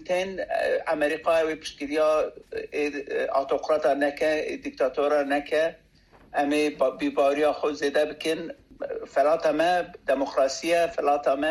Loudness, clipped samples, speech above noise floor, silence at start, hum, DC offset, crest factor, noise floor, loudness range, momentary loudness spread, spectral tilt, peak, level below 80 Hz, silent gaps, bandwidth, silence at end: -25 LUFS; under 0.1%; 31 dB; 0 s; none; under 0.1%; 14 dB; -56 dBFS; 1 LU; 7 LU; -3.5 dB/octave; -12 dBFS; -60 dBFS; none; 13.5 kHz; 0 s